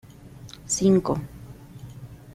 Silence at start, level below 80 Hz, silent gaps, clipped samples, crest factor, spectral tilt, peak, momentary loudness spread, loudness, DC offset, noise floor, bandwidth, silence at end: 0.25 s; -50 dBFS; none; under 0.1%; 18 dB; -5.5 dB/octave; -8 dBFS; 24 LU; -23 LUFS; under 0.1%; -44 dBFS; 15 kHz; 0 s